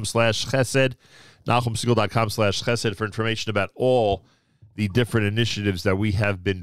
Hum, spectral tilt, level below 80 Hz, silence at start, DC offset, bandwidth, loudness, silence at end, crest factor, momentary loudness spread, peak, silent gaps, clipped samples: none; -5 dB/octave; -48 dBFS; 0 s; 0.8%; 15 kHz; -23 LUFS; 0 s; 16 dB; 5 LU; -6 dBFS; none; under 0.1%